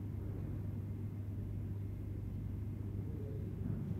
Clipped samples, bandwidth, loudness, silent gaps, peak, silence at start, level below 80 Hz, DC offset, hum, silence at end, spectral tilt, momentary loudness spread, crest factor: under 0.1%; 14 kHz; -43 LUFS; none; -28 dBFS; 0 s; -50 dBFS; under 0.1%; none; 0 s; -10 dB/octave; 1 LU; 14 dB